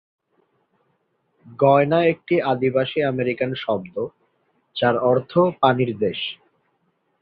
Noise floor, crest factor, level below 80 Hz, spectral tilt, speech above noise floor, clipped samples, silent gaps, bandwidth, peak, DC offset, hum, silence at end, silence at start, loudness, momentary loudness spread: -69 dBFS; 20 dB; -62 dBFS; -10 dB/octave; 49 dB; under 0.1%; none; 5 kHz; -2 dBFS; under 0.1%; none; 0.85 s; 1.45 s; -20 LUFS; 13 LU